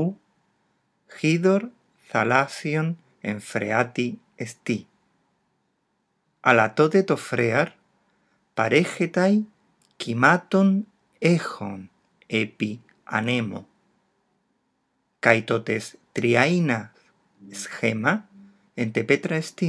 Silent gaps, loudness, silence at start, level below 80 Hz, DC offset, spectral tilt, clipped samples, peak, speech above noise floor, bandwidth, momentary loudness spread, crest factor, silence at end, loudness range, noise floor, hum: none; -23 LUFS; 0 s; -78 dBFS; under 0.1%; -6 dB/octave; under 0.1%; 0 dBFS; 50 dB; 11 kHz; 15 LU; 24 dB; 0 s; 6 LU; -73 dBFS; none